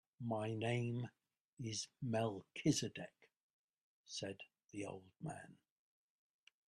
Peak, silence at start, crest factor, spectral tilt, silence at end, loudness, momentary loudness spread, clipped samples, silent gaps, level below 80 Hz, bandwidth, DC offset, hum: -22 dBFS; 0.2 s; 22 dB; -5 dB/octave; 1.15 s; -44 LUFS; 15 LU; under 0.1%; 1.41-1.57 s, 3.40-4.04 s; -78 dBFS; 12.5 kHz; under 0.1%; none